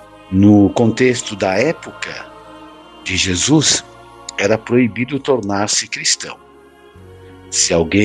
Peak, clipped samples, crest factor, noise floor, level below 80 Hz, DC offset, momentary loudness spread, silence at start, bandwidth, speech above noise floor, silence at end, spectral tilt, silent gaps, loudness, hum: 0 dBFS; under 0.1%; 16 dB; -44 dBFS; -46 dBFS; under 0.1%; 16 LU; 0.3 s; 11.5 kHz; 29 dB; 0 s; -4 dB/octave; none; -15 LUFS; none